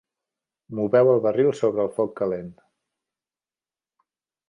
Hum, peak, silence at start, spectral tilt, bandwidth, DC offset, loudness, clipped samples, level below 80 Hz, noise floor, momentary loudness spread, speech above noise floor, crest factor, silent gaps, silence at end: none; -8 dBFS; 0.7 s; -8 dB/octave; 10.5 kHz; under 0.1%; -22 LUFS; under 0.1%; -66 dBFS; under -90 dBFS; 15 LU; over 69 dB; 18 dB; none; 1.95 s